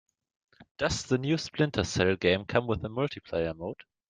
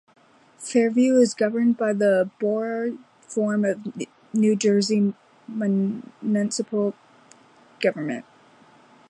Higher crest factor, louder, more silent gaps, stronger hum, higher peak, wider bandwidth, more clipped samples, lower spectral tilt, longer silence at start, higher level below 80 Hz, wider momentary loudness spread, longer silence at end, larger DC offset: about the same, 20 dB vs 18 dB; second, -29 LUFS vs -23 LUFS; first, 0.71-0.75 s vs none; neither; second, -10 dBFS vs -6 dBFS; second, 9.8 kHz vs 11 kHz; neither; about the same, -5 dB/octave vs -5.5 dB/octave; about the same, 0.6 s vs 0.6 s; first, -54 dBFS vs -76 dBFS; second, 7 LU vs 12 LU; second, 0.35 s vs 0.9 s; neither